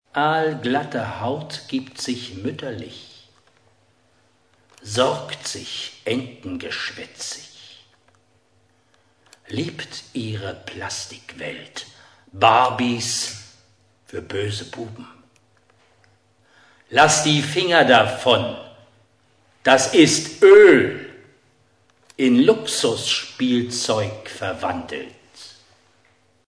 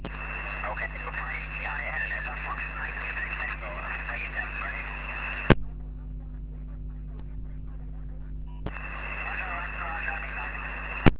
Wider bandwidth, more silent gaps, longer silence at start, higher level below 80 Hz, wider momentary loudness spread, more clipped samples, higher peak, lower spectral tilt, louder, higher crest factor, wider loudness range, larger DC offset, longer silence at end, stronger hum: first, 11 kHz vs 4 kHz; neither; first, 0.15 s vs 0 s; second, -62 dBFS vs -38 dBFS; first, 20 LU vs 11 LU; neither; about the same, 0 dBFS vs 0 dBFS; about the same, -3.5 dB/octave vs -4.5 dB/octave; first, -19 LUFS vs -32 LUFS; second, 22 dB vs 30 dB; first, 18 LU vs 7 LU; neither; first, 1 s vs 0 s; neither